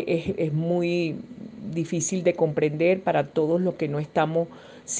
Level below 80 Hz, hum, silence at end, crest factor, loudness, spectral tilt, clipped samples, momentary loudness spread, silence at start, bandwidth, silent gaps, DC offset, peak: -64 dBFS; none; 0 s; 16 dB; -25 LUFS; -5.5 dB/octave; under 0.1%; 11 LU; 0 s; 10 kHz; none; under 0.1%; -8 dBFS